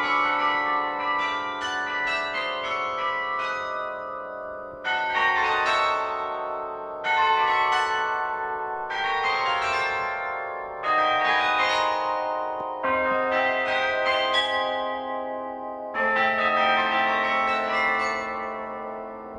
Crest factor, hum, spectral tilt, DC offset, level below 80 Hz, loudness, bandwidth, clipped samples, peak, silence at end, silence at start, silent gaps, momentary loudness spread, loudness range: 16 dB; none; -2.5 dB/octave; under 0.1%; -60 dBFS; -24 LUFS; 11 kHz; under 0.1%; -10 dBFS; 0 s; 0 s; none; 11 LU; 3 LU